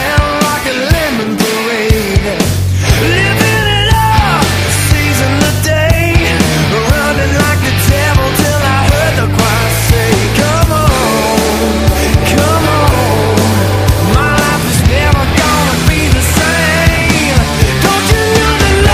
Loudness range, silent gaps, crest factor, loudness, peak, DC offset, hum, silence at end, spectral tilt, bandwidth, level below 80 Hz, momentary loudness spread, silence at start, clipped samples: 1 LU; none; 10 dB; -10 LUFS; 0 dBFS; under 0.1%; none; 0 s; -4.5 dB/octave; 16 kHz; -18 dBFS; 2 LU; 0 s; 0.2%